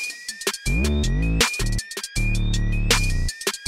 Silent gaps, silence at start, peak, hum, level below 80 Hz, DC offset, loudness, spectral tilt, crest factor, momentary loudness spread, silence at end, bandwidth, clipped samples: none; 0 s; -8 dBFS; none; -26 dBFS; 0.4%; -23 LUFS; -3.5 dB/octave; 14 dB; 7 LU; 0 s; 16 kHz; under 0.1%